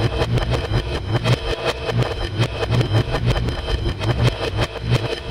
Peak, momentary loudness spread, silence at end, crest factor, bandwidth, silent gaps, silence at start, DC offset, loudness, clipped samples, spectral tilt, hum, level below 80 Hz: -6 dBFS; 4 LU; 0 s; 14 dB; 12 kHz; none; 0 s; 0.2%; -21 LUFS; under 0.1%; -6 dB/octave; none; -28 dBFS